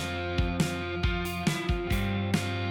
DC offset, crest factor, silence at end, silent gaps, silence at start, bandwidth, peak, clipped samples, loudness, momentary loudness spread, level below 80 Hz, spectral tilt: under 0.1%; 16 dB; 0 s; none; 0 s; 18 kHz; -12 dBFS; under 0.1%; -30 LUFS; 2 LU; -36 dBFS; -5.5 dB/octave